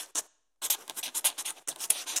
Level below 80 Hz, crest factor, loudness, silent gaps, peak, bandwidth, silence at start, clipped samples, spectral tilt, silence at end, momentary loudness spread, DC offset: -88 dBFS; 28 dB; -31 LUFS; none; -6 dBFS; 16.5 kHz; 0 s; under 0.1%; 3 dB/octave; 0 s; 7 LU; under 0.1%